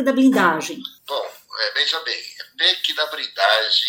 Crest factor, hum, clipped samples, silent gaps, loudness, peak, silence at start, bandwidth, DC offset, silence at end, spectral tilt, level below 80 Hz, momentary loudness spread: 18 dB; none; under 0.1%; none; -19 LUFS; -2 dBFS; 0 s; 17 kHz; under 0.1%; 0 s; -3 dB/octave; -78 dBFS; 14 LU